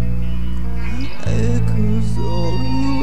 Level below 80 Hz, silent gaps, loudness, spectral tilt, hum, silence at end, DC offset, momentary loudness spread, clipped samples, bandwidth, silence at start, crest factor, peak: -26 dBFS; none; -21 LUFS; -7.5 dB/octave; none; 0 s; 20%; 7 LU; under 0.1%; 10.5 kHz; 0 s; 12 dB; -4 dBFS